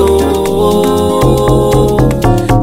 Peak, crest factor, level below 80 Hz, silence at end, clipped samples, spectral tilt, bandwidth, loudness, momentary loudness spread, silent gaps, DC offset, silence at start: 0 dBFS; 8 dB; -20 dBFS; 0 s; under 0.1%; -6.5 dB/octave; 16.5 kHz; -10 LUFS; 2 LU; none; under 0.1%; 0 s